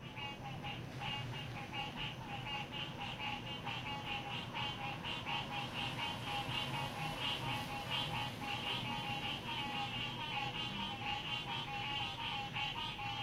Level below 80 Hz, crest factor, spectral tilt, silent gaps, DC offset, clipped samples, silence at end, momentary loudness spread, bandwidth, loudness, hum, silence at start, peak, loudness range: -62 dBFS; 14 dB; -4 dB/octave; none; under 0.1%; under 0.1%; 0 s; 5 LU; 16 kHz; -40 LUFS; none; 0 s; -26 dBFS; 3 LU